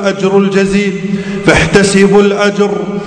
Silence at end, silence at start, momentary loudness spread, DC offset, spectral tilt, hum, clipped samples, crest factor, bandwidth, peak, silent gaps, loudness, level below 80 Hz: 0 s; 0 s; 7 LU; under 0.1%; -5.5 dB/octave; none; 2%; 10 dB; 11 kHz; 0 dBFS; none; -10 LUFS; -32 dBFS